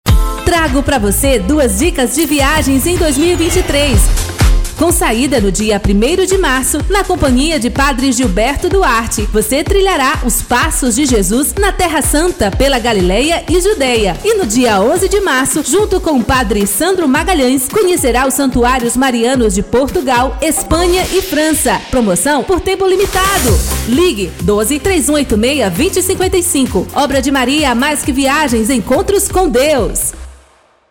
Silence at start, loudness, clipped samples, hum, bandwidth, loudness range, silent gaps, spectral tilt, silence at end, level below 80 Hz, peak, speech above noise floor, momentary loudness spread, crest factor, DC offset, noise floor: 0.05 s; -12 LUFS; under 0.1%; none; 19 kHz; 1 LU; none; -4 dB/octave; 0.55 s; -20 dBFS; 0 dBFS; 36 dB; 2 LU; 12 dB; under 0.1%; -48 dBFS